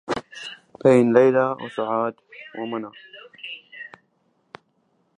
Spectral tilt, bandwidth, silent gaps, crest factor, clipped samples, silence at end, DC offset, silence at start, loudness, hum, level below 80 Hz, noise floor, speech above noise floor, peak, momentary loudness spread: -6.5 dB/octave; 10 kHz; none; 22 dB; under 0.1%; 1.3 s; under 0.1%; 0.1 s; -21 LUFS; none; -66 dBFS; -67 dBFS; 47 dB; -2 dBFS; 24 LU